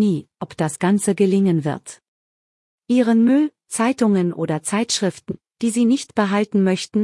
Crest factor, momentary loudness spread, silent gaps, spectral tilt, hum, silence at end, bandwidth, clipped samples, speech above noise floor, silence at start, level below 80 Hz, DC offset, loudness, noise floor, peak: 16 dB; 10 LU; 2.08-2.78 s; -5.5 dB/octave; none; 0 s; 12 kHz; under 0.1%; over 72 dB; 0 s; -64 dBFS; under 0.1%; -19 LUFS; under -90 dBFS; -4 dBFS